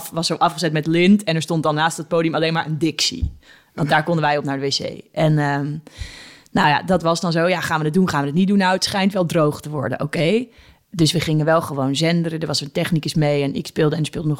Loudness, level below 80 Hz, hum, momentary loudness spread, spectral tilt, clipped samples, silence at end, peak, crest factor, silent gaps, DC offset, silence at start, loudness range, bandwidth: -19 LUFS; -44 dBFS; none; 9 LU; -5.5 dB/octave; under 0.1%; 0 s; -4 dBFS; 16 dB; none; under 0.1%; 0 s; 2 LU; 16.5 kHz